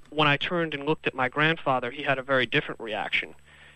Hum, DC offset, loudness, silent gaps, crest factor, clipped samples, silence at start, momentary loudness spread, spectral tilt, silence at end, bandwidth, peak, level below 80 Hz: none; under 0.1%; -26 LUFS; none; 18 dB; under 0.1%; 0 s; 5 LU; -6 dB/octave; 0.1 s; 11 kHz; -8 dBFS; -60 dBFS